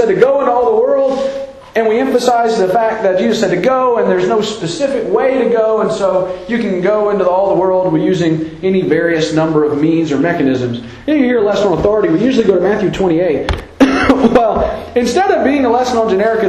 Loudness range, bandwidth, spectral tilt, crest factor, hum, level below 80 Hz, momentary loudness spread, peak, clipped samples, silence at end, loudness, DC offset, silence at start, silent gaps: 1 LU; 12.5 kHz; -6 dB/octave; 12 dB; none; -36 dBFS; 6 LU; 0 dBFS; under 0.1%; 0 s; -13 LUFS; under 0.1%; 0 s; none